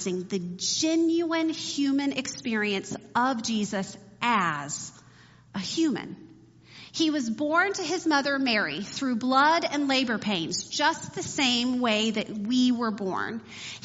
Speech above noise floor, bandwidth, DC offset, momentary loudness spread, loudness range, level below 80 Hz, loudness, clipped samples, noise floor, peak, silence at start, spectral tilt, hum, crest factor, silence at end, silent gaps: 27 dB; 8 kHz; under 0.1%; 10 LU; 5 LU; -68 dBFS; -26 LUFS; under 0.1%; -54 dBFS; -10 dBFS; 0 s; -2.5 dB/octave; none; 18 dB; 0.05 s; none